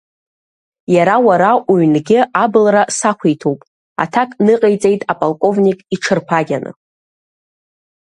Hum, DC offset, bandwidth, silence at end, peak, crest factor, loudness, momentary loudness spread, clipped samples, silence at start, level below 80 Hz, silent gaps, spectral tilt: none; under 0.1%; 11.5 kHz; 1.4 s; 0 dBFS; 14 dB; -13 LUFS; 10 LU; under 0.1%; 0.9 s; -60 dBFS; 3.67-3.96 s; -5.5 dB/octave